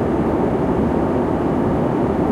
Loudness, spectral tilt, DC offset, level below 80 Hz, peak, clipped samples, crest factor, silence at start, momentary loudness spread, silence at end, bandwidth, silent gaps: -19 LUFS; -9 dB/octave; under 0.1%; -34 dBFS; -6 dBFS; under 0.1%; 12 dB; 0 s; 1 LU; 0 s; 11.5 kHz; none